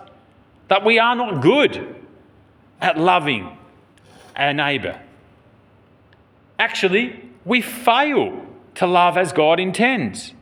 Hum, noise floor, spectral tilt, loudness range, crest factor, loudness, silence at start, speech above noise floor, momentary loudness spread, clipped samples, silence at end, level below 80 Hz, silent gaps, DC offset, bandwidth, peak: none; -53 dBFS; -4.5 dB/octave; 5 LU; 20 dB; -18 LUFS; 0 s; 35 dB; 19 LU; under 0.1%; 0.1 s; -64 dBFS; none; under 0.1%; over 20 kHz; 0 dBFS